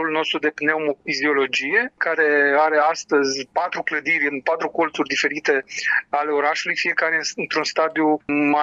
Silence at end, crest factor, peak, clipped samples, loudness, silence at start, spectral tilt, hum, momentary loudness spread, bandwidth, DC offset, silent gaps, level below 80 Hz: 0 s; 16 dB; -6 dBFS; under 0.1%; -20 LUFS; 0 s; -2.5 dB/octave; none; 6 LU; 8 kHz; under 0.1%; none; -70 dBFS